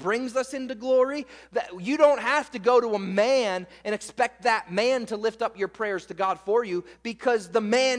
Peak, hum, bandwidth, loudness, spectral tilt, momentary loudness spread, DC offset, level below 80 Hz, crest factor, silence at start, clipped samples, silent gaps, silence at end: -6 dBFS; none; 10.5 kHz; -25 LUFS; -4 dB/octave; 10 LU; under 0.1%; -66 dBFS; 20 dB; 0 s; under 0.1%; none; 0 s